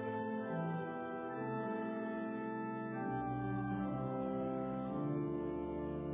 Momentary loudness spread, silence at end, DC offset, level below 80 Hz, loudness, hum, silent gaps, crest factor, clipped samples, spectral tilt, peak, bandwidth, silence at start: 3 LU; 0 s; under 0.1%; -62 dBFS; -40 LUFS; none; none; 12 dB; under 0.1%; -8 dB/octave; -28 dBFS; 3.8 kHz; 0 s